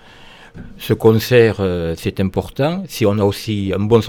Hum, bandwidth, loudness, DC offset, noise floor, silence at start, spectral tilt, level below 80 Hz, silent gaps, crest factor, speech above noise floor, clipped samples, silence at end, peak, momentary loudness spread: none; 18 kHz; -17 LUFS; under 0.1%; -41 dBFS; 0.55 s; -6.5 dB/octave; -42 dBFS; none; 16 dB; 25 dB; under 0.1%; 0 s; 0 dBFS; 9 LU